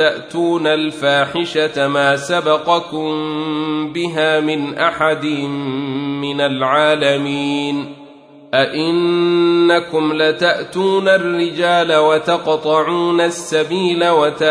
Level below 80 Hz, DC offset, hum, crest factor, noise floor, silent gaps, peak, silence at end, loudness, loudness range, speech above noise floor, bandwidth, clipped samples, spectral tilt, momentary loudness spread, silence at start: -60 dBFS; under 0.1%; none; 14 dB; -40 dBFS; none; 0 dBFS; 0 s; -16 LUFS; 3 LU; 25 dB; 10.5 kHz; under 0.1%; -5 dB/octave; 7 LU; 0 s